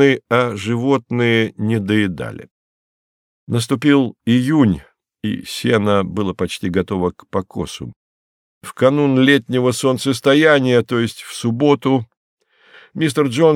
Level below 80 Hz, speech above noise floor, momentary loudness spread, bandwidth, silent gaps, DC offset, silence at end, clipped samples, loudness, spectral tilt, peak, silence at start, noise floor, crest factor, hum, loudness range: -52 dBFS; 31 dB; 13 LU; 15.5 kHz; 2.51-3.47 s, 7.96-8.61 s, 12.17-12.37 s; under 0.1%; 0 s; under 0.1%; -17 LUFS; -6 dB/octave; 0 dBFS; 0 s; -48 dBFS; 16 dB; none; 5 LU